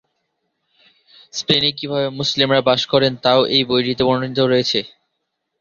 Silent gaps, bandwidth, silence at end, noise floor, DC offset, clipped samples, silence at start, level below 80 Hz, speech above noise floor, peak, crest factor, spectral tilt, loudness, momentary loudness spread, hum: none; 7.4 kHz; 0.7 s; -75 dBFS; under 0.1%; under 0.1%; 1.35 s; -54 dBFS; 58 dB; 0 dBFS; 18 dB; -4.5 dB/octave; -17 LUFS; 7 LU; none